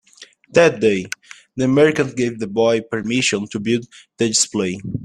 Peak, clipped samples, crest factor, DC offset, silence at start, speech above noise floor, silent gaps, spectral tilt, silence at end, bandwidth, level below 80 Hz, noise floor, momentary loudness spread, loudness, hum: 0 dBFS; under 0.1%; 18 dB; under 0.1%; 0.2 s; 28 dB; none; -4 dB/octave; 0 s; 12.5 kHz; -56 dBFS; -46 dBFS; 9 LU; -18 LUFS; none